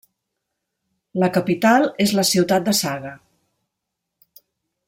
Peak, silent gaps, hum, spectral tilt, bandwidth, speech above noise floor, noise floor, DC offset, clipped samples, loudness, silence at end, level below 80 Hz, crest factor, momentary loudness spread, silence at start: -4 dBFS; none; none; -4 dB/octave; 16.5 kHz; 62 dB; -80 dBFS; under 0.1%; under 0.1%; -18 LUFS; 1.7 s; -62 dBFS; 18 dB; 13 LU; 1.15 s